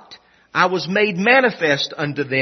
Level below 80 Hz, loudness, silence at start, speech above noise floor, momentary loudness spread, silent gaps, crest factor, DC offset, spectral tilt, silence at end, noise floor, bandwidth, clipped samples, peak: -66 dBFS; -17 LUFS; 0.1 s; 29 dB; 9 LU; none; 18 dB; under 0.1%; -5 dB/octave; 0 s; -46 dBFS; 6.4 kHz; under 0.1%; 0 dBFS